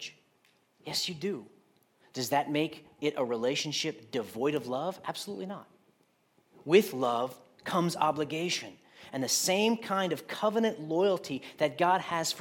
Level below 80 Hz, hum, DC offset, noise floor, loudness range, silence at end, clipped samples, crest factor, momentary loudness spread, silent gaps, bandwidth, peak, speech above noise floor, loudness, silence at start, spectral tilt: -80 dBFS; none; under 0.1%; -69 dBFS; 5 LU; 0 s; under 0.1%; 22 dB; 13 LU; none; 17.5 kHz; -10 dBFS; 39 dB; -31 LUFS; 0 s; -3.5 dB/octave